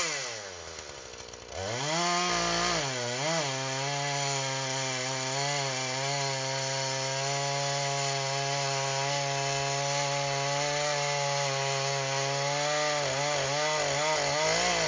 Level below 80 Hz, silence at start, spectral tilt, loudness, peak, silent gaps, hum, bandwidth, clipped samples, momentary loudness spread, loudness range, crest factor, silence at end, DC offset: -60 dBFS; 0 s; -2.5 dB/octave; -28 LUFS; -14 dBFS; none; none; 7.8 kHz; under 0.1%; 5 LU; 2 LU; 16 dB; 0 s; under 0.1%